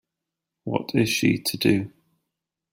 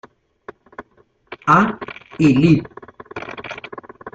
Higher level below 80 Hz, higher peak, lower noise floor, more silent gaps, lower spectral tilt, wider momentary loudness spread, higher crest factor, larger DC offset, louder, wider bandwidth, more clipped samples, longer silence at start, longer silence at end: second, -60 dBFS vs -52 dBFS; second, -6 dBFS vs -2 dBFS; first, -85 dBFS vs -57 dBFS; neither; second, -5 dB/octave vs -7.5 dB/octave; second, 13 LU vs 25 LU; about the same, 20 dB vs 18 dB; neither; second, -23 LUFS vs -16 LUFS; first, 16 kHz vs 8 kHz; neither; second, 0.65 s vs 0.8 s; first, 0.85 s vs 0.05 s